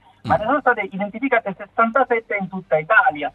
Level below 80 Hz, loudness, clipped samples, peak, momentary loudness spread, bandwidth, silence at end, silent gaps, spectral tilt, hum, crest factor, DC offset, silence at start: -54 dBFS; -19 LUFS; under 0.1%; -2 dBFS; 10 LU; 7.2 kHz; 0.05 s; none; -8 dB/octave; none; 18 dB; under 0.1%; 0.25 s